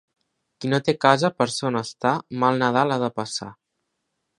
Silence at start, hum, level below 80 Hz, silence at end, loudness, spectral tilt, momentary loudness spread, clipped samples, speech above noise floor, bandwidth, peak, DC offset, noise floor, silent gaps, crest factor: 0.6 s; none; -66 dBFS; 0.85 s; -22 LUFS; -5 dB/octave; 11 LU; under 0.1%; 55 dB; 11.5 kHz; 0 dBFS; under 0.1%; -77 dBFS; none; 24 dB